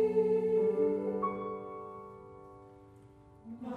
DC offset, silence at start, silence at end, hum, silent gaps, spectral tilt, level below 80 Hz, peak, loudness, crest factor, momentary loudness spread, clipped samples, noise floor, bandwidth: under 0.1%; 0 s; 0 s; none; none; -9.5 dB/octave; -68 dBFS; -18 dBFS; -32 LUFS; 16 dB; 23 LU; under 0.1%; -57 dBFS; 4.6 kHz